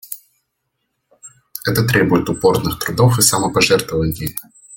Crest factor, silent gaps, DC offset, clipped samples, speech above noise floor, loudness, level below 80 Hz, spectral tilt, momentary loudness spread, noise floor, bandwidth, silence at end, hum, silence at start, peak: 18 dB; none; under 0.1%; under 0.1%; 57 dB; -16 LUFS; -42 dBFS; -4 dB/octave; 16 LU; -73 dBFS; 17 kHz; 0 s; none; 0.1 s; 0 dBFS